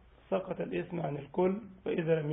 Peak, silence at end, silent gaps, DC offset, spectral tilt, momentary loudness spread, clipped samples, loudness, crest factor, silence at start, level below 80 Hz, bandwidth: -16 dBFS; 0 s; none; under 0.1%; -11 dB/octave; 6 LU; under 0.1%; -34 LUFS; 16 dB; 0.3 s; -64 dBFS; 4 kHz